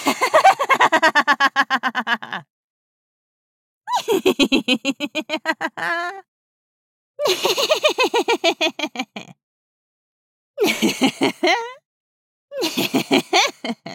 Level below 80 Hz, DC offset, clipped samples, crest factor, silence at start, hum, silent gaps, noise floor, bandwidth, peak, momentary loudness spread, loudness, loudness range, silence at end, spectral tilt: -62 dBFS; under 0.1%; under 0.1%; 18 dB; 0 s; none; 2.50-3.81 s, 6.28-7.14 s, 9.43-10.54 s, 11.85-12.48 s; under -90 dBFS; 17.5 kHz; -2 dBFS; 12 LU; -18 LUFS; 4 LU; 0 s; -2.5 dB/octave